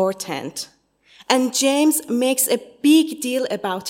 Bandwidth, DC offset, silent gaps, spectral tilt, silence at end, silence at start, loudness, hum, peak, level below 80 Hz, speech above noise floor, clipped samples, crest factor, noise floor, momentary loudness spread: 16.5 kHz; under 0.1%; none; -2.5 dB/octave; 0 s; 0 s; -19 LUFS; none; 0 dBFS; -72 dBFS; 33 dB; under 0.1%; 20 dB; -52 dBFS; 12 LU